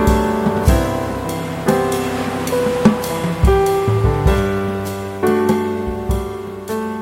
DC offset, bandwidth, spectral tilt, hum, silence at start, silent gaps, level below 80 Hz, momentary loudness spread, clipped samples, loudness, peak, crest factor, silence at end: under 0.1%; 16.5 kHz; -6.5 dB/octave; none; 0 s; none; -24 dBFS; 8 LU; under 0.1%; -18 LUFS; 0 dBFS; 16 dB; 0 s